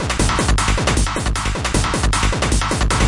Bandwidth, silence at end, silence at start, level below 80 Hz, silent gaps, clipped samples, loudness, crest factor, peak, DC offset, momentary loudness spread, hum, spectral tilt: 11.5 kHz; 0 s; 0 s; -20 dBFS; none; under 0.1%; -18 LUFS; 14 dB; -2 dBFS; under 0.1%; 3 LU; none; -4 dB/octave